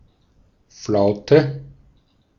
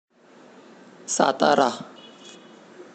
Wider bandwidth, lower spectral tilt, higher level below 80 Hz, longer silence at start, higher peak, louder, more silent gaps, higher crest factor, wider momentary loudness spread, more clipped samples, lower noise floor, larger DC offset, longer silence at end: second, 7.2 kHz vs 9.2 kHz; first, -7 dB/octave vs -3 dB/octave; first, -54 dBFS vs -80 dBFS; second, 0.8 s vs 1.05 s; about the same, -2 dBFS vs -4 dBFS; first, -18 LUFS vs -21 LUFS; neither; about the same, 20 dB vs 22 dB; second, 19 LU vs 25 LU; neither; first, -58 dBFS vs -51 dBFS; neither; first, 0.7 s vs 0.1 s